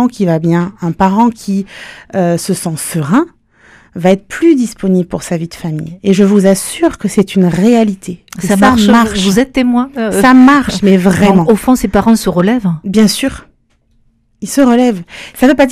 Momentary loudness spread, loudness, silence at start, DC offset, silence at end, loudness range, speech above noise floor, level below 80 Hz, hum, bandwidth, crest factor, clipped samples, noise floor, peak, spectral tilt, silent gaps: 11 LU; -11 LUFS; 0 s; under 0.1%; 0 s; 5 LU; 44 dB; -36 dBFS; none; 15.5 kHz; 10 dB; 0.5%; -54 dBFS; 0 dBFS; -6 dB/octave; none